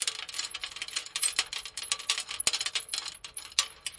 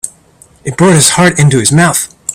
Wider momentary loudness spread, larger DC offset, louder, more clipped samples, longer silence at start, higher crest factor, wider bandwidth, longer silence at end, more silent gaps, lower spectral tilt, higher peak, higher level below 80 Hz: second, 8 LU vs 16 LU; neither; second, -31 LUFS vs -7 LUFS; second, under 0.1% vs 0.3%; about the same, 0 s vs 0.05 s; first, 32 dB vs 10 dB; second, 11.5 kHz vs over 20 kHz; about the same, 0 s vs 0 s; neither; second, 2.5 dB/octave vs -4 dB/octave; second, -4 dBFS vs 0 dBFS; second, -66 dBFS vs -42 dBFS